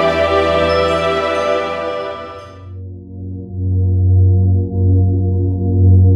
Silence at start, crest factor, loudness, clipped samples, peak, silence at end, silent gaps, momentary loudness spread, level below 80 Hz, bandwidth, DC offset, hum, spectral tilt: 0 s; 12 dB; -15 LUFS; under 0.1%; -2 dBFS; 0 s; none; 19 LU; -34 dBFS; 7.4 kHz; under 0.1%; none; -8 dB/octave